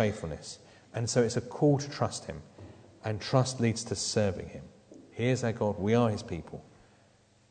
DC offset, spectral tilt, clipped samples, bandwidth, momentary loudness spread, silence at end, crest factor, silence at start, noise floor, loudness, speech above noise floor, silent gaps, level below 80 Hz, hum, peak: under 0.1%; -5.5 dB/octave; under 0.1%; 9.4 kHz; 20 LU; 0.9 s; 22 dB; 0 s; -63 dBFS; -30 LUFS; 33 dB; none; -58 dBFS; none; -10 dBFS